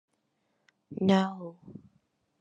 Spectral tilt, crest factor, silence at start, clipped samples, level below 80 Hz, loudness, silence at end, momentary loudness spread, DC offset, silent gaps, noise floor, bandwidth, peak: -7 dB/octave; 22 dB; 0.9 s; under 0.1%; -74 dBFS; -28 LUFS; 0.6 s; 25 LU; under 0.1%; none; -77 dBFS; 7.6 kHz; -10 dBFS